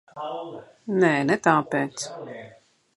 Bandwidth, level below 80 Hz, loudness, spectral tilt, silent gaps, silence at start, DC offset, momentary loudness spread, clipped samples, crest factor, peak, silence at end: 11.5 kHz; -70 dBFS; -24 LUFS; -5.5 dB/octave; none; 0.15 s; under 0.1%; 19 LU; under 0.1%; 22 dB; -2 dBFS; 0.5 s